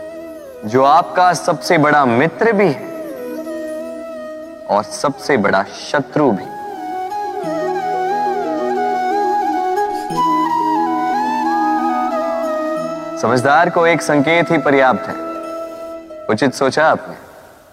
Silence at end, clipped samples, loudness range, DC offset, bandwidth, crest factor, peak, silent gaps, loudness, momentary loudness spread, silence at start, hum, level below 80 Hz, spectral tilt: 0.2 s; under 0.1%; 5 LU; under 0.1%; 15.5 kHz; 16 dB; 0 dBFS; none; -16 LUFS; 15 LU; 0 s; none; -56 dBFS; -5 dB/octave